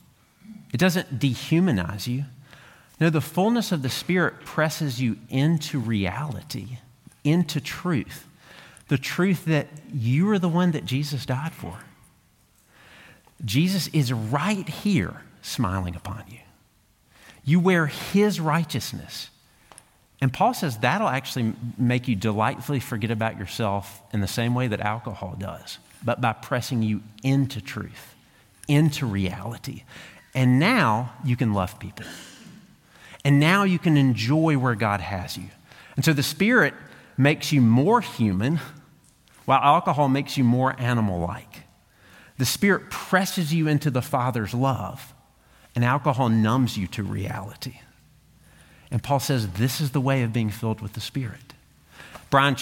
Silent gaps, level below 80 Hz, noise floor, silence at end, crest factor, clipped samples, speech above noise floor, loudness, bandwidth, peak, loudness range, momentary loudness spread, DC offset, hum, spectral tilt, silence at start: none; -56 dBFS; -61 dBFS; 0 s; 20 dB; under 0.1%; 38 dB; -24 LUFS; 17 kHz; -4 dBFS; 6 LU; 15 LU; under 0.1%; none; -6 dB/octave; 0.5 s